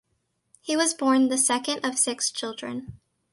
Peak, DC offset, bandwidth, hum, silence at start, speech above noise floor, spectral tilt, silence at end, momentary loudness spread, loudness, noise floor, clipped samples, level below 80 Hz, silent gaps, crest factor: -8 dBFS; under 0.1%; 11.5 kHz; none; 0.65 s; 49 dB; -1.5 dB/octave; 0.35 s; 14 LU; -24 LUFS; -74 dBFS; under 0.1%; -64 dBFS; none; 18 dB